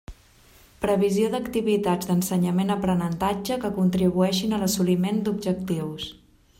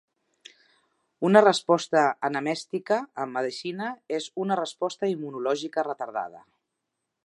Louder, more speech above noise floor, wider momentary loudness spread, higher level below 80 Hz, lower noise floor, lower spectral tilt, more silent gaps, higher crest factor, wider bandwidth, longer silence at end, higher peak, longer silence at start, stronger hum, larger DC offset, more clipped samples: about the same, -24 LUFS vs -26 LUFS; second, 31 dB vs 57 dB; second, 6 LU vs 13 LU; first, -50 dBFS vs -82 dBFS; second, -54 dBFS vs -82 dBFS; about the same, -6 dB/octave vs -5 dB/octave; neither; second, 14 dB vs 24 dB; first, 16.5 kHz vs 11.5 kHz; second, 0.45 s vs 0.85 s; second, -10 dBFS vs -2 dBFS; second, 0.1 s vs 1.2 s; neither; neither; neither